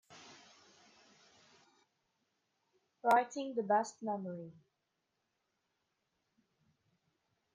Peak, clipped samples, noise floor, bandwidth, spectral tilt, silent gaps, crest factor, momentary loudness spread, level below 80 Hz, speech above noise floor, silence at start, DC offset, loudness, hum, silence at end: -18 dBFS; under 0.1%; -85 dBFS; 9 kHz; -5 dB/octave; none; 24 dB; 25 LU; under -90 dBFS; 51 dB; 0.1 s; under 0.1%; -35 LUFS; none; 3.05 s